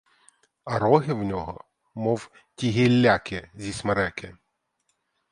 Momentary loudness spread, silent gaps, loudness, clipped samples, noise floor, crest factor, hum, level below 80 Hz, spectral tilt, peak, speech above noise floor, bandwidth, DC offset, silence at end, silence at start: 23 LU; none; -24 LUFS; under 0.1%; -75 dBFS; 22 dB; none; -52 dBFS; -6.5 dB/octave; -4 dBFS; 51 dB; 11 kHz; under 0.1%; 1 s; 0.65 s